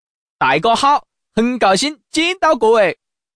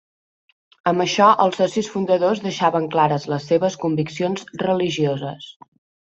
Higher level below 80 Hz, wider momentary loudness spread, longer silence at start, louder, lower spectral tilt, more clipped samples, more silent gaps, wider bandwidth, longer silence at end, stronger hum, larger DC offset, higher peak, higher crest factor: first, -52 dBFS vs -64 dBFS; second, 6 LU vs 10 LU; second, 0.4 s vs 0.85 s; first, -15 LUFS vs -20 LUFS; second, -3.5 dB/octave vs -5.5 dB/octave; neither; neither; first, 10.5 kHz vs 8.2 kHz; second, 0.45 s vs 0.65 s; neither; neither; about the same, -4 dBFS vs -2 dBFS; second, 12 dB vs 18 dB